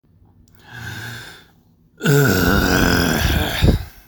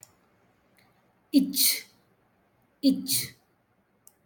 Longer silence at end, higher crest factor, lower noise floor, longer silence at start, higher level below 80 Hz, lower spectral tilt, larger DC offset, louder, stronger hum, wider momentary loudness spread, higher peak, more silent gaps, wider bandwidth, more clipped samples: second, 0.2 s vs 0.95 s; second, 16 dB vs 22 dB; second, -54 dBFS vs -69 dBFS; second, 0.7 s vs 1.35 s; first, -28 dBFS vs -74 dBFS; first, -5 dB/octave vs -2 dB/octave; neither; first, -16 LUFS vs -25 LUFS; second, none vs 60 Hz at -60 dBFS; first, 18 LU vs 8 LU; first, -2 dBFS vs -10 dBFS; neither; first, over 20 kHz vs 17.5 kHz; neither